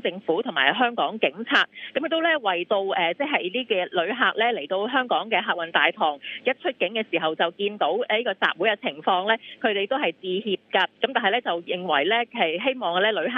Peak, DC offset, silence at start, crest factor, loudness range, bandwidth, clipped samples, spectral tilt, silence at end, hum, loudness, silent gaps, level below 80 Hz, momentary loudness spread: -4 dBFS; under 0.1%; 0.05 s; 20 dB; 1 LU; 7.4 kHz; under 0.1%; -5.5 dB/octave; 0 s; none; -23 LUFS; none; -80 dBFS; 5 LU